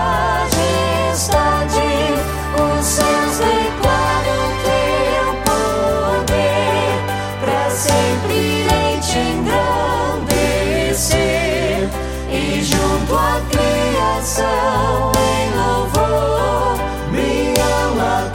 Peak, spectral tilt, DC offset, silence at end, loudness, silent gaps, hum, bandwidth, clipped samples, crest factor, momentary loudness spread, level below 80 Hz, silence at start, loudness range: 0 dBFS; -4 dB/octave; under 0.1%; 0 s; -16 LUFS; none; none; 17 kHz; under 0.1%; 16 dB; 3 LU; -28 dBFS; 0 s; 1 LU